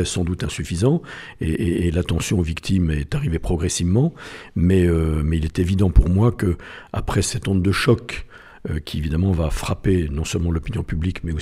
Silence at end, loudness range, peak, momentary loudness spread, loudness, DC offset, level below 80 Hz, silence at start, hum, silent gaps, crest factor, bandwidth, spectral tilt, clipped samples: 0 s; 3 LU; 0 dBFS; 10 LU; -21 LUFS; under 0.1%; -30 dBFS; 0 s; none; none; 20 dB; 14 kHz; -6 dB/octave; under 0.1%